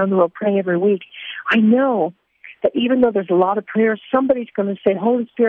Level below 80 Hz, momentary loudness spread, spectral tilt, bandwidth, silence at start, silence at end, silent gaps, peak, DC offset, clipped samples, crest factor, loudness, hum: -60 dBFS; 8 LU; -9 dB/octave; 4.1 kHz; 0 s; 0 s; none; -2 dBFS; under 0.1%; under 0.1%; 14 dB; -18 LUFS; none